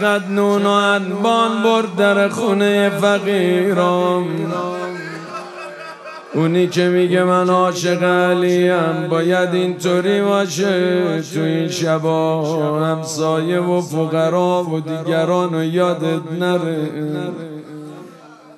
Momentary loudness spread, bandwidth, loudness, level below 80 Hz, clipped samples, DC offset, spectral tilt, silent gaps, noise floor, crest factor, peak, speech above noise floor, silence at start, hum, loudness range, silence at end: 12 LU; 13.5 kHz; -17 LUFS; -72 dBFS; under 0.1%; under 0.1%; -5.5 dB/octave; none; -41 dBFS; 16 dB; 0 dBFS; 24 dB; 0 s; none; 4 LU; 0.25 s